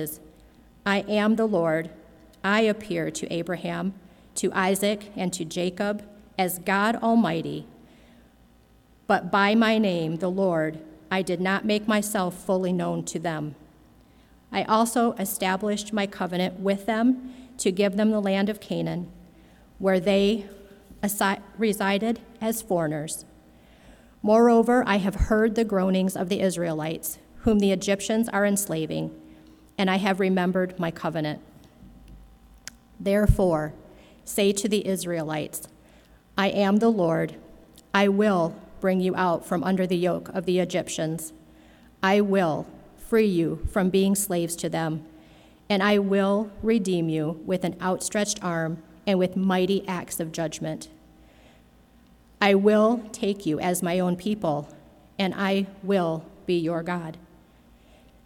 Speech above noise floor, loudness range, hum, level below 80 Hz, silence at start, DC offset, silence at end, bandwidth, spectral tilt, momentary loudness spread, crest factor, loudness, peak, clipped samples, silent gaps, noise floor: 33 dB; 4 LU; none; -44 dBFS; 0 s; under 0.1%; 1.1 s; 18 kHz; -5 dB/octave; 11 LU; 20 dB; -25 LUFS; -6 dBFS; under 0.1%; none; -57 dBFS